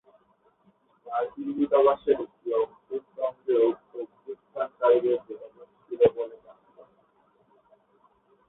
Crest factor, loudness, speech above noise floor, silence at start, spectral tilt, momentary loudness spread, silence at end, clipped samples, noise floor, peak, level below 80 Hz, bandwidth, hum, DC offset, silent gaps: 20 dB; -26 LUFS; 41 dB; 1.05 s; -10 dB/octave; 18 LU; 1.95 s; under 0.1%; -65 dBFS; -8 dBFS; -68 dBFS; 4 kHz; none; under 0.1%; none